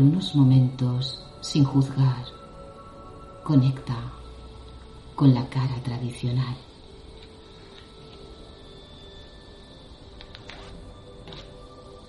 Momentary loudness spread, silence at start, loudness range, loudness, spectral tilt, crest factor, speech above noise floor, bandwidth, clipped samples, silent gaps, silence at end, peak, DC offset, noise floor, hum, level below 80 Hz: 26 LU; 0 s; 20 LU; -24 LUFS; -7.5 dB/octave; 20 dB; 24 dB; 11.5 kHz; under 0.1%; none; 0.1 s; -6 dBFS; under 0.1%; -46 dBFS; none; -48 dBFS